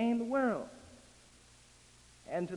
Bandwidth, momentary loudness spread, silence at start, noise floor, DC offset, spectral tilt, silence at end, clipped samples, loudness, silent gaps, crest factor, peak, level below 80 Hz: 11.5 kHz; 25 LU; 0 s; -61 dBFS; under 0.1%; -6.5 dB/octave; 0 s; under 0.1%; -34 LUFS; none; 18 dB; -20 dBFS; -68 dBFS